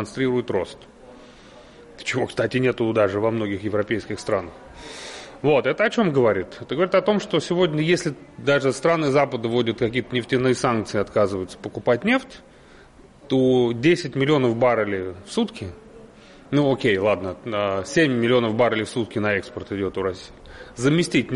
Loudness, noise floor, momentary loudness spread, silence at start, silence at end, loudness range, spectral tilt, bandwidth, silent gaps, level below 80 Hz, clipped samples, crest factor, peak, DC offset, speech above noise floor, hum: -22 LUFS; -48 dBFS; 11 LU; 0 s; 0 s; 3 LU; -6 dB/octave; 11.5 kHz; none; -54 dBFS; under 0.1%; 14 dB; -8 dBFS; under 0.1%; 27 dB; none